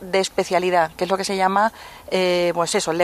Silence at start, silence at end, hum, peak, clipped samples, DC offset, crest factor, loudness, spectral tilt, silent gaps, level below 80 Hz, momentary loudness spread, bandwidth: 0 s; 0 s; none; -4 dBFS; under 0.1%; under 0.1%; 16 dB; -20 LUFS; -3.5 dB/octave; none; -56 dBFS; 4 LU; 15 kHz